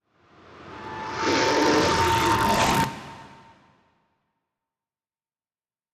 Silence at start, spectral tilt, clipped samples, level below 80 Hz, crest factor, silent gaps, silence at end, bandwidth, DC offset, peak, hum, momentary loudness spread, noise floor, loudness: 0.55 s; -4 dB/octave; under 0.1%; -48 dBFS; 16 dB; none; 2.6 s; 15.5 kHz; under 0.1%; -10 dBFS; none; 20 LU; under -90 dBFS; -22 LUFS